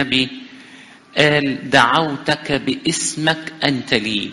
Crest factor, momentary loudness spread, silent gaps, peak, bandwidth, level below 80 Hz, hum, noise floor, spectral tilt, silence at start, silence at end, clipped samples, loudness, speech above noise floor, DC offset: 18 dB; 7 LU; none; 0 dBFS; 11.5 kHz; -52 dBFS; none; -43 dBFS; -3.5 dB/octave; 0 s; 0 s; under 0.1%; -17 LUFS; 25 dB; under 0.1%